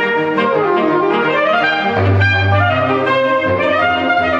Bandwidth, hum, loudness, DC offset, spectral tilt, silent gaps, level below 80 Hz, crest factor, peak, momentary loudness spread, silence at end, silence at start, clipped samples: 7 kHz; none; -14 LUFS; under 0.1%; -7.5 dB/octave; none; -50 dBFS; 12 dB; -2 dBFS; 2 LU; 0 s; 0 s; under 0.1%